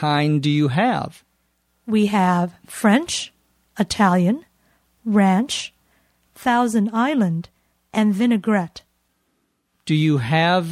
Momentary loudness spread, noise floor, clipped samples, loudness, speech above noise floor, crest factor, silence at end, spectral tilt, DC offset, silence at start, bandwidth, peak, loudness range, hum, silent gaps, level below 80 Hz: 12 LU; -69 dBFS; under 0.1%; -20 LUFS; 51 dB; 18 dB; 0 s; -5.5 dB/octave; under 0.1%; 0 s; 14.5 kHz; -4 dBFS; 2 LU; none; none; -58 dBFS